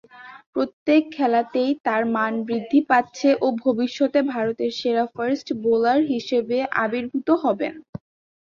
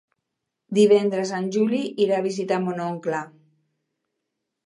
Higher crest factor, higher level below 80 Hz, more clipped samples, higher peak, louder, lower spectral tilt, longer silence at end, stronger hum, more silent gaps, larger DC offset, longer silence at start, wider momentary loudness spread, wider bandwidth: about the same, 18 dB vs 18 dB; first, -66 dBFS vs -78 dBFS; neither; about the same, -4 dBFS vs -6 dBFS; about the same, -22 LUFS vs -22 LUFS; about the same, -5.5 dB/octave vs -6 dB/octave; second, 0.5 s vs 1.4 s; neither; first, 0.46-0.53 s, 0.73-0.86 s, 1.80-1.84 s, 7.89-7.93 s vs none; neither; second, 0.15 s vs 0.7 s; second, 7 LU vs 11 LU; second, 7.2 kHz vs 11 kHz